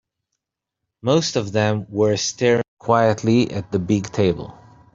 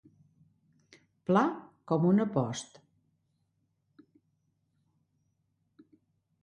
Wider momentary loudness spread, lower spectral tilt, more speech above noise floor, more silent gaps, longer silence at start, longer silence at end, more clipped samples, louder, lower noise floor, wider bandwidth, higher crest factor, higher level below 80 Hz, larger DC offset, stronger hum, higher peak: second, 6 LU vs 17 LU; second, -5.5 dB/octave vs -7 dB/octave; first, 63 dB vs 49 dB; first, 2.68-2.77 s vs none; second, 1.05 s vs 1.3 s; second, 0.4 s vs 3.8 s; neither; first, -20 LUFS vs -29 LUFS; first, -82 dBFS vs -77 dBFS; second, 7.8 kHz vs 10 kHz; about the same, 18 dB vs 22 dB; first, -54 dBFS vs -76 dBFS; neither; neither; first, -2 dBFS vs -12 dBFS